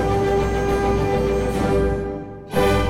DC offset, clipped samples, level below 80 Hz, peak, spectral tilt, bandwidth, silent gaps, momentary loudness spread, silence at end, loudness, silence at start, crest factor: under 0.1%; under 0.1%; -28 dBFS; -6 dBFS; -6.5 dB/octave; 16 kHz; none; 7 LU; 0 s; -21 LUFS; 0 s; 14 dB